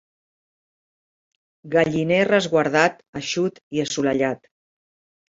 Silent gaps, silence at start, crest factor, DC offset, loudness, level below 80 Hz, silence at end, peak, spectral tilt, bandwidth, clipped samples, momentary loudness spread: 3.08-3.13 s, 3.63-3.71 s; 1.65 s; 22 dB; under 0.1%; -21 LUFS; -60 dBFS; 0.95 s; -2 dBFS; -5 dB/octave; 7.8 kHz; under 0.1%; 9 LU